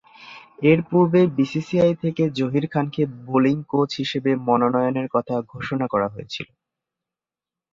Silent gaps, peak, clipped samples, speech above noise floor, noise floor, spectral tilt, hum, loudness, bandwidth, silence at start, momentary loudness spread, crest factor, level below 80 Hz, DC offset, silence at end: none; -4 dBFS; under 0.1%; 69 dB; -90 dBFS; -7.5 dB/octave; none; -21 LUFS; 7.6 kHz; 0.2 s; 13 LU; 18 dB; -60 dBFS; under 0.1%; 1.3 s